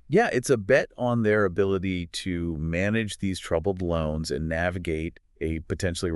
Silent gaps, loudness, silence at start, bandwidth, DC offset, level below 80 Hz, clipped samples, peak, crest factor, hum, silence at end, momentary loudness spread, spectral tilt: none; -26 LUFS; 0.1 s; 12 kHz; under 0.1%; -46 dBFS; under 0.1%; -6 dBFS; 20 dB; none; 0 s; 8 LU; -6 dB/octave